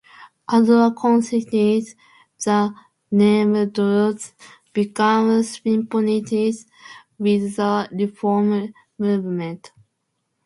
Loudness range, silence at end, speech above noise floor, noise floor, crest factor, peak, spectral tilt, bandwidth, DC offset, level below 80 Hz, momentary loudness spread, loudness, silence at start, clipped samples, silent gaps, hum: 4 LU; 0.8 s; 55 dB; -74 dBFS; 16 dB; -4 dBFS; -6.5 dB/octave; 11.5 kHz; under 0.1%; -66 dBFS; 12 LU; -19 LUFS; 0.2 s; under 0.1%; none; none